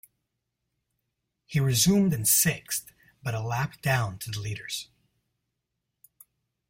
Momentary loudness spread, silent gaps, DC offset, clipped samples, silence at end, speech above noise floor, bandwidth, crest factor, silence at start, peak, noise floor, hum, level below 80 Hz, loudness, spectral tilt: 13 LU; none; under 0.1%; under 0.1%; 1.85 s; 57 dB; 16.5 kHz; 20 dB; 1.5 s; -10 dBFS; -83 dBFS; none; -58 dBFS; -26 LUFS; -4 dB/octave